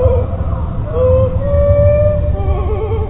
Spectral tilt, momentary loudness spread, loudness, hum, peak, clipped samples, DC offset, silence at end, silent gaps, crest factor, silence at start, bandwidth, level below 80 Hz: -12.5 dB/octave; 9 LU; -14 LUFS; none; 0 dBFS; under 0.1%; under 0.1%; 0 s; none; 12 dB; 0 s; 3.7 kHz; -20 dBFS